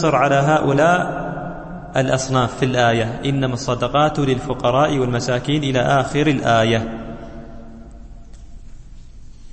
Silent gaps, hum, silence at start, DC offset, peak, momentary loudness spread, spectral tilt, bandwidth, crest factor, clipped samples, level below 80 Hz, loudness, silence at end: none; none; 0 s; under 0.1%; -2 dBFS; 16 LU; -5.5 dB/octave; 8.8 kHz; 16 dB; under 0.1%; -38 dBFS; -18 LUFS; 0 s